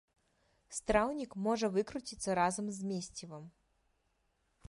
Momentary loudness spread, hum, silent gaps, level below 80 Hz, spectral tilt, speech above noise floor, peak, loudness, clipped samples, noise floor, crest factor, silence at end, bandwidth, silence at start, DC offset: 13 LU; none; none; -60 dBFS; -4.5 dB/octave; 43 dB; -16 dBFS; -35 LUFS; under 0.1%; -78 dBFS; 22 dB; 1.2 s; 11.5 kHz; 0.7 s; under 0.1%